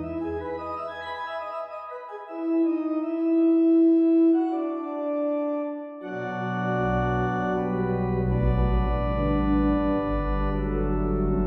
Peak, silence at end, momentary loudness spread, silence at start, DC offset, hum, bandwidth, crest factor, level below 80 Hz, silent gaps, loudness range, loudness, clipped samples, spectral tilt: -12 dBFS; 0 s; 13 LU; 0 s; under 0.1%; none; 5.2 kHz; 12 dB; -34 dBFS; none; 5 LU; -25 LUFS; under 0.1%; -10 dB/octave